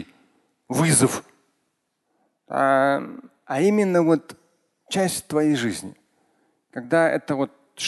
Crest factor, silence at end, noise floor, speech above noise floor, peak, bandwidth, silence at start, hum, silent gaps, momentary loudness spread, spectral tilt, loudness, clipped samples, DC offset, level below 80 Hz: 18 dB; 0 s; -74 dBFS; 53 dB; -4 dBFS; 12.5 kHz; 0 s; none; none; 15 LU; -4.5 dB/octave; -22 LUFS; under 0.1%; under 0.1%; -62 dBFS